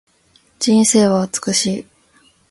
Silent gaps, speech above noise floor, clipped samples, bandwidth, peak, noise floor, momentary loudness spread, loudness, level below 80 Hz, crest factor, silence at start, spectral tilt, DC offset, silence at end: none; 41 dB; under 0.1%; 11.5 kHz; -2 dBFS; -56 dBFS; 10 LU; -15 LUFS; -58 dBFS; 16 dB; 0.6 s; -4 dB/octave; under 0.1%; 0.7 s